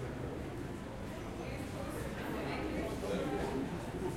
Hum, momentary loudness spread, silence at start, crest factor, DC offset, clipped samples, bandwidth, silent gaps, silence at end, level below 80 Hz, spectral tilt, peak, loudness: none; 7 LU; 0 s; 16 dB; under 0.1%; under 0.1%; 16.5 kHz; none; 0 s; -50 dBFS; -6 dB/octave; -24 dBFS; -40 LUFS